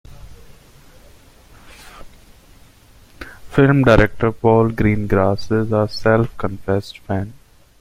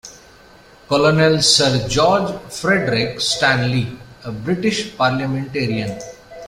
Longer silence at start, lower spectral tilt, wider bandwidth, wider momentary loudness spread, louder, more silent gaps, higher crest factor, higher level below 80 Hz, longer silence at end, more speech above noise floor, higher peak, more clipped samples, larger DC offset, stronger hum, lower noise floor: about the same, 0.1 s vs 0.05 s; first, -8 dB/octave vs -4 dB/octave; about the same, 14.5 kHz vs 15.5 kHz; about the same, 13 LU vs 15 LU; about the same, -17 LUFS vs -17 LUFS; neither; about the same, 18 dB vs 18 dB; first, -36 dBFS vs -46 dBFS; first, 0.45 s vs 0 s; about the same, 31 dB vs 28 dB; about the same, 0 dBFS vs 0 dBFS; neither; neither; neither; about the same, -47 dBFS vs -45 dBFS